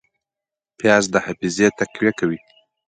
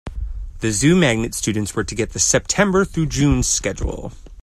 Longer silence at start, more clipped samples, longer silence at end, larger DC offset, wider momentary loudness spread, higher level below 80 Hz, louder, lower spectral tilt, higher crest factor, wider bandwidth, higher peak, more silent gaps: first, 0.8 s vs 0.05 s; neither; first, 0.5 s vs 0.05 s; neither; second, 8 LU vs 16 LU; second, -58 dBFS vs -30 dBFS; about the same, -19 LUFS vs -18 LUFS; about the same, -4.5 dB/octave vs -4 dB/octave; about the same, 20 dB vs 18 dB; second, 9.6 kHz vs 15 kHz; about the same, 0 dBFS vs 0 dBFS; neither